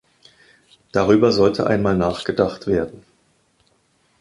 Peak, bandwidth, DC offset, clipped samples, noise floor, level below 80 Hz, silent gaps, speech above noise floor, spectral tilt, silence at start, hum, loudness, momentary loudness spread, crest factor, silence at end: -2 dBFS; 11.5 kHz; under 0.1%; under 0.1%; -62 dBFS; -46 dBFS; none; 44 dB; -6.5 dB/octave; 0.95 s; none; -19 LUFS; 8 LU; 18 dB; 1.3 s